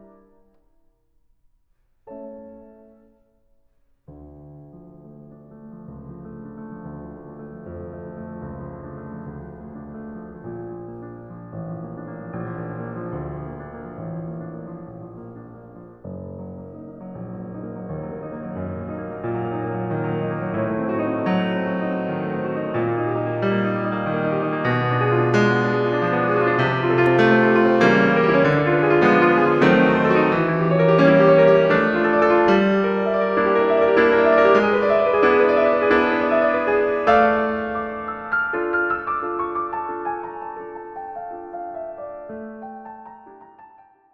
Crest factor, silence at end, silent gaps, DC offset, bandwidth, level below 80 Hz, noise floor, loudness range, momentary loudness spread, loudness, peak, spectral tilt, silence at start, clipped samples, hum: 18 dB; 0.5 s; none; under 0.1%; 7.2 kHz; -52 dBFS; -63 dBFS; 20 LU; 22 LU; -19 LUFS; -2 dBFS; -8 dB/octave; 2.05 s; under 0.1%; none